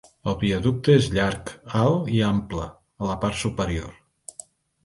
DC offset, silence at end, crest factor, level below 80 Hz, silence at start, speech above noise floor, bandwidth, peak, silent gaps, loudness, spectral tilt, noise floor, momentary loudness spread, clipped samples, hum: under 0.1%; 0.95 s; 20 dB; -42 dBFS; 0.25 s; 24 dB; 11.5 kHz; -4 dBFS; none; -24 LUFS; -6 dB/octave; -47 dBFS; 21 LU; under 0.1%; none